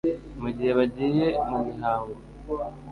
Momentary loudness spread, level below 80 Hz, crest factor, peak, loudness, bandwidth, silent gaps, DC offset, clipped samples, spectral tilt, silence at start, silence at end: 10 LU; -48 dBFS; 16 dB; -10 dBFS; -27 LUFS; 10.5 kHz; none; under 0.1%; under 0.1%; -8.5 dB/octave; 0.05 s; 0 s